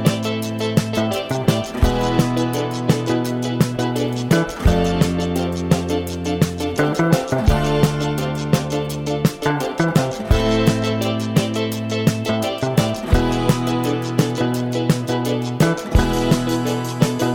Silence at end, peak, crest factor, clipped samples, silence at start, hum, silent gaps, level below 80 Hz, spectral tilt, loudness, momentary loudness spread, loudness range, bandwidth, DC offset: 0 s; -4 dBFS; 16 dB; under 0.1%; 0 s; none; none; -30 dBFS; -6 dB/octave; -20 LUFS; 4 LU; 1 LU; 17.5 kHz; under 0.1%